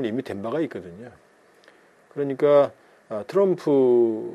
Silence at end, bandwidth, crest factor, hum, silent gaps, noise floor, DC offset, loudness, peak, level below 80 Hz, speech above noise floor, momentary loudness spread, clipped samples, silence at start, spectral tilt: 0 s; 11 kHz; 16 dB; none; none; -55 dBFS; under 0.1%; -22 LUFS; -6 dBFS; -72 dBFS; 33 dB; 19 LU; under 0.1%; 0 s; -8 dB/octave